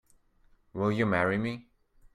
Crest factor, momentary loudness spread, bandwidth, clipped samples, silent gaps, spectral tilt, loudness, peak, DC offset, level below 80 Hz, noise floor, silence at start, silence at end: 20 dB; 16 LU; 10.5 kHz; under 0.1%; none; -7.5 dB/octave; -29 LUFS; -12 dBFS; under 0.1%; -62 dBFS; -64 dBFS; 0.75 s; 0.55 s